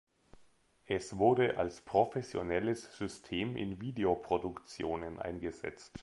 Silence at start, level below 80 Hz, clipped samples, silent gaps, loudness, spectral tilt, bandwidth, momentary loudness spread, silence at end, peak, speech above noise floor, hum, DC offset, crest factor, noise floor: 0.35 s; -60 dBFS; under 0.1%; none; -35 LUFS; -6 dB/octave; 11.5 kHz; 11 LU; 0 s; -14 dBFS; 31 dB; none; under 0.1%; 22 dB; -65 dBFS